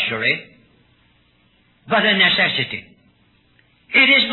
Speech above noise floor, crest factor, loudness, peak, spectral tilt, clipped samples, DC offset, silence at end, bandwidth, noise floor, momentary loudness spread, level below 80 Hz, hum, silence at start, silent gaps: 41 dB; 18 dB; -15 LUFS; -2 dBFS; -6 dB/octave; under 0.1%; under 0.1%; 0 s; 4.3 kHz; -58 dBFS; 13 LU; -62 dBFS; none; 0 s; none